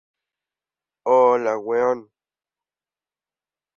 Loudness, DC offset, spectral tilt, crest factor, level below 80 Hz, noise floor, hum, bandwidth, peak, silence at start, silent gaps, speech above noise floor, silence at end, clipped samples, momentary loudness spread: -20 LUFS; under 0.1%; -6 dB/octave; 18 dB; -72 dBFS; under -90 dBFS; none; 7 kHz; -6 dBFS; 1.05 s; none; over 71 dB; 1.75 s; under 0.1%; 12 LU